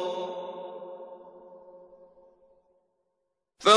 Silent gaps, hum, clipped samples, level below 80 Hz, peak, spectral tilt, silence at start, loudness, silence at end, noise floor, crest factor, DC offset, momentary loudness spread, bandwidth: none; none; under 0.1%; -80 dBFS; -6 dBFS; -2 dB/octave; 0 s; -35 LUFS; 0 s; -81 dBFS; 24 dB; under 0.1%; 21 LU; 10.5 kHz